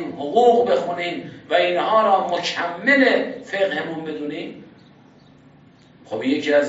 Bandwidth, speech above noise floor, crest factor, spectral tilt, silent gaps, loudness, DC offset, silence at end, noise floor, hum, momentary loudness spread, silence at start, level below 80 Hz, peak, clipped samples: 8 kHz; 30 dB; 16 dB; -2 dB/octave; none; -20 LUFS; under 0.1%; 0 s; -50 dBFS; none; 13 LU; 0 s; -68 dBFS; -4 dBFS; under 0.1%